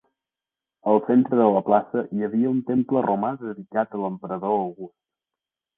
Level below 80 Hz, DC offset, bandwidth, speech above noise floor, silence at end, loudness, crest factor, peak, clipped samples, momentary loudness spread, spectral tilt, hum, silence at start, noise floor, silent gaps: -68 dBFS; under 0.1%; 3.7 kHz; 67 dB; 0.9 s; -23 LUFS; 20 dB; -4 dBFS; under 0.1%; 11 LU; -11.5 dB/octave; none; 0.85 s; -89 dBFS; none